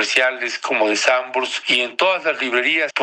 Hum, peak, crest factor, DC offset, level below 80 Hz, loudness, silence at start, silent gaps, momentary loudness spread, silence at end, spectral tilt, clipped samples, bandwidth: none; -2 dBFS; 18 dB; under 0.1%; -76 dBFS; -18 LUFS; 0 s; none; 5 LU; 0 s; -1 dB/octave; under 0.1%; 11 kHz